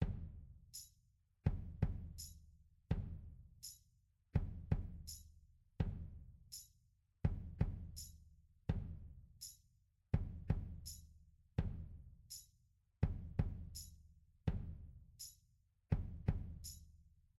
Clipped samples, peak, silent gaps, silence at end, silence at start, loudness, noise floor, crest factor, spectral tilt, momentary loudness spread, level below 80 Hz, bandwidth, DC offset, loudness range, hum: under 0.1%; -22 dBFS; none; 0.3 s; 0 s; -46 LUFS; -76 dBFS; 24 dB; -6 dB/octave; 17 LU; -50 dBFS; 16 kHz; under 0.1%; 1 LU; none